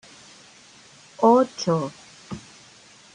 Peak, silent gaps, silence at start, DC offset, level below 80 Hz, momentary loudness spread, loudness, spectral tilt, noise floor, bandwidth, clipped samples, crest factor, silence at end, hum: -4 dBFS; none; 1.2 s; under 0.1%; -66 dBFS; 21 LU; -21 LUFS; -6 dB/octave; -50 dBFS; 10 kHz; under 0.1%; 20 dB; 0.75 s; none